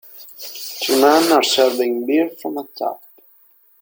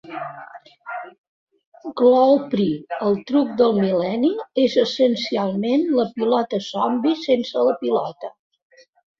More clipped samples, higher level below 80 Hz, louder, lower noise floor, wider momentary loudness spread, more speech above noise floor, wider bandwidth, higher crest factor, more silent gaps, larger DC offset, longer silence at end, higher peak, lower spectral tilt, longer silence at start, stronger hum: neither; about the same, -68 dBFS vs -64 dBFS; first, -17 LUFS vs -20 LUFS; first, -53 dBFS vs -41 dBFS; about the same, 18 LU vs 17 LU; first, 37 dB vs 22 dB; first, 17 kHz vs 7.2 kHz; about the same, 18 dB vs 16 dB; second, none vs 1.18-1.47 s, 1.66-1.72 s; neither; about the same, 0.85 s vs 0.9 s; about the same, -2 dBFS vs -4 dBFS; second, -2 dB/octave vs -6.5 dB/octave; about the same, 0.15 s vs 0.05 s; neither